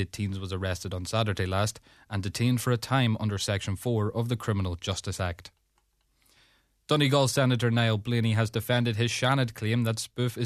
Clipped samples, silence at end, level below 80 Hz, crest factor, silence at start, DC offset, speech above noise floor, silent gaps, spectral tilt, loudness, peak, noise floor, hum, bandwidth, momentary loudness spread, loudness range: under 0.1%; 0 s; -56 dBFS; 18 dB; 0 s; under 0.1%; 44 dB; none; -5.5 dB/octave; -28 LUFS; -10 dBFS; -71 dBFS; none; 14 kHz; 8 LU; 6 LU